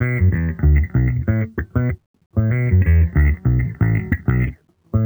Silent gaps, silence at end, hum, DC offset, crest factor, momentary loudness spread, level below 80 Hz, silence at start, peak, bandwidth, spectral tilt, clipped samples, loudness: 2.06-2.14 s, 2.26-2.30 s; 0 s; none; under 0.1%; 12 dB; 8 LU; -22 dBFS; 0 s; -4 dBFS; over 20 kHz; -12 dB/octave; under 0.1%; -19 LUFS